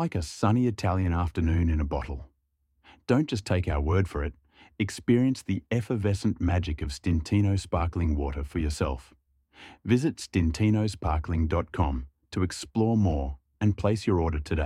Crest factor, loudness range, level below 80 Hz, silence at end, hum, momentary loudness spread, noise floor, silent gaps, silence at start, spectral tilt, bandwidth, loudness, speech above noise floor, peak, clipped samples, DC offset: 18 dB; 2 LU; -36 dBFS; 0 s; none; 8 LU; -73 dBFS; none; 0 s; -7 dB/octave; 12 kHz; -28 LUFS; 47 dB; -10 dBFS; under 0.1%; under 0.1%